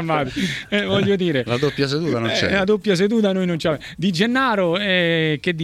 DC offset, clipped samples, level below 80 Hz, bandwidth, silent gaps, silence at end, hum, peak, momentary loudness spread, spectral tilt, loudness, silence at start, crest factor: under 0.1%; under 0.1%; -50 dBFS; 13.5 kHz; none; 0 s; none; -2 dBFS; 5 LU; -5.5 dB/octave; -19 LUFS; 0 s; 16 dB